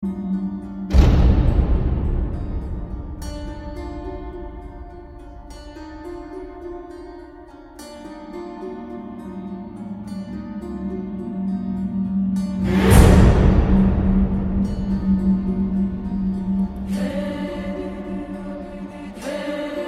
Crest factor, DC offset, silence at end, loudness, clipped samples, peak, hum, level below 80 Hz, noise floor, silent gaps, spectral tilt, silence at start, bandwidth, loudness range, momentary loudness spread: 20 dB; under 0.1%; 0 s; -21 LUFS; under 0.1%; 0 dBFS; none; -24 dBFS; -41 dBFS; none; -7.5 dB/octave; 0 s; 14.5 kHz; 19 LU; 21 LU